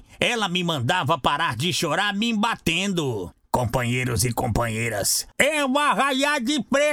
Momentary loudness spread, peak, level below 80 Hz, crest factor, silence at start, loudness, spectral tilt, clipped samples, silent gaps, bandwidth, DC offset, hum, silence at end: 4 LU; -4 dBFS; -46 dBFS; 20 dB; 0.1 s; -22 LUFS; -3.5 dB/octave; under 0.1%; none; over 20 kHz; under 0.1%; none; 0 s